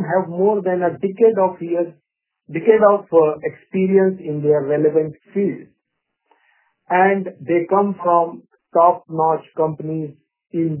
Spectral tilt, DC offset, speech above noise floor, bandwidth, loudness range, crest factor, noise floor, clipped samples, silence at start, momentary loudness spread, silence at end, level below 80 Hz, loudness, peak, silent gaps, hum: -12 dB/octave; under 0.1%; 59 dB; 3.2 kHz; 3 LU; 18 dB; -76 dBFS; under 0.1%; 0 s; 10 LU; 0 s; -68 dBFS; -18 LUFS; 0 dBFS; none; none